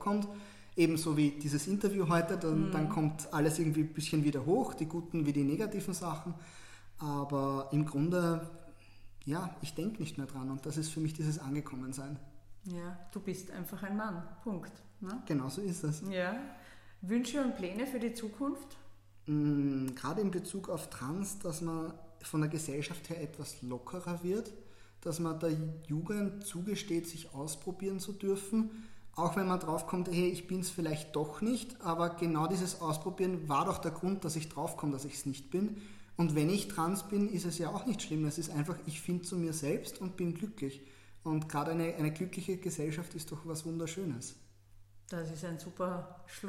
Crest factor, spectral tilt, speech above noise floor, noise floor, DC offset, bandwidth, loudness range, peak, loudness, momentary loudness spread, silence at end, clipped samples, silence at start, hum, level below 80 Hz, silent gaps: 20 dB; -6 dB/octave; 23 dB; -58 dBFS; under 0.1%; 16 kHz; 7 LU; -16 dBFS; -36 LUFS; 12 LU; 0 s; under 0.1%; 0 s; none; -62 dBFS; none